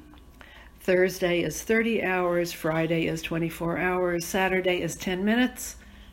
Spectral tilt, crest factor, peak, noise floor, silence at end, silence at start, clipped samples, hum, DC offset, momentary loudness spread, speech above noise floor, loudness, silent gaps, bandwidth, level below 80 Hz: -5 dB/octave; 16 dB; -10 dBFS; -49 dBFS; 0 s; 0 s; under 0.1%; none; under 0.1%; 6 LU; 23 dB; -26 LUFS; none; 17 kHz; -50 dBFS